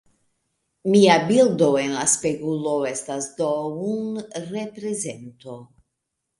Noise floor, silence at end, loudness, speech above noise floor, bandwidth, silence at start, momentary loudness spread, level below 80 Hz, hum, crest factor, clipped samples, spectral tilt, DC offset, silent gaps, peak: -79 dBFS; 0.75 s; -21 LUFS; 58 dB; 11.5 kHz; 0.85 s; 16 LU; -66 dBFS; none; 20 dB; under 0.1%; -4 dB/octave; under 0.1%; none; -2 dBFS